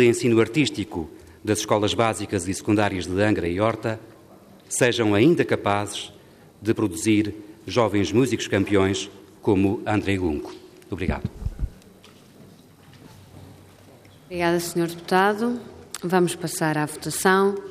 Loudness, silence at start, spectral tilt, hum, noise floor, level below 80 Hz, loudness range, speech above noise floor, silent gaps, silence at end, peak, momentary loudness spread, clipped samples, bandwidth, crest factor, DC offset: -23 LUFS; 0 s; -5 dB/octave; none; -49 dBFS; -46 dBFS; 9 LU; 27 dB; none; 0 s; -6 dBFS; 14 LU; under 0.1%; 15.5 kHz; 18 dB; under 0.1%